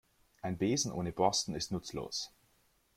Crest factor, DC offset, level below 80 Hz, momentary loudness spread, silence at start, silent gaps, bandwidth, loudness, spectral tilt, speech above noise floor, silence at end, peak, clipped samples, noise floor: 22 dB; under 0.1%; -62 dBFS; 10 LU; 0.45 s; none; 16 kHz; -35 LUFS; -4 dB/octave; 37 dB; 0.7 s; -14 dBFS; under 0.1%; -72 dBFS